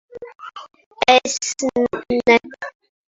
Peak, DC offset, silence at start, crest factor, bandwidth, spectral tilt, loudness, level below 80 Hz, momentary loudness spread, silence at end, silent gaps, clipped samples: 0 dBFS; under 0.1%; 0.15 s; 20 dB; 8 kHz; -2 dB/octave; -17 LUFS; -56 dBFS; 21 LU; 0.4 s; 0.86-0.91 s; under 0.1%